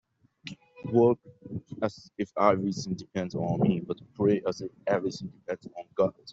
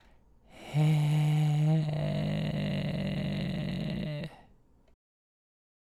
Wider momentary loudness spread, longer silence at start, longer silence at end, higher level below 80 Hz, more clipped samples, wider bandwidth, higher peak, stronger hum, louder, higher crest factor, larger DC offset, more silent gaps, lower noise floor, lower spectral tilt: first, 17 LU vs 9 LU; about the same, 0.45 s vs 0.55 s; second, 0 s vs 1.5 s; second, -64 dBFS vs -54 dBFS; neither; second, 8 kHz vs 11.5 kHz; first, -8 dBFS vs -18 dBFS; neither; about the same, -29 LUFS vs -30 LUFS; first, 22 dB vs 14 dB; neither; neither; second, -47 dBFS vs -61 dBFS; about the same, -7 dB/octave vs -7.5 dB/octave